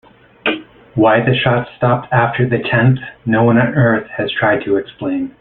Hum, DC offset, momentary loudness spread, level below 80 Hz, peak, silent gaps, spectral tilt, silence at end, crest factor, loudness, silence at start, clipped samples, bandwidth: none; under 0.1%; 9 LU; -48 dBFS; -2 dBFS; none; -11 dB/octave; 0.1 s; 14 dB; -15 LUFS; 0.45 s; under 0.1%; 4.2 kHz